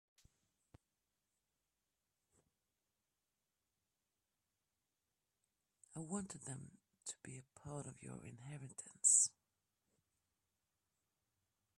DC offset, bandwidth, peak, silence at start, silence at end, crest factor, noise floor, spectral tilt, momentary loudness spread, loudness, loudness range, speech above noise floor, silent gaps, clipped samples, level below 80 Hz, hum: under 0.1%; 13 kHz; -18 dBFS; 5.95 s; 2.5 s; 30 dB; under -90 dBFS; -2.5 dB/octave; 23 LU; -35 LUFS; 14 LU; over 48 dB; none; under 0.1%; -82 dBFS; none